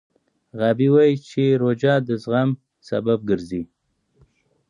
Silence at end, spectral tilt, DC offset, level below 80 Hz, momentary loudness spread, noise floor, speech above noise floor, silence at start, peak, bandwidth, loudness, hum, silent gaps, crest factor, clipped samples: 1.05 s; -8 dB/octave; under 0.1%; -58 dBFS; 14 LU; -60 dBFS; 40 dB; 0.55 s; -6 dBFS; 10 kHz; -20 LUFS; none; none; 16 dB; under 0.1%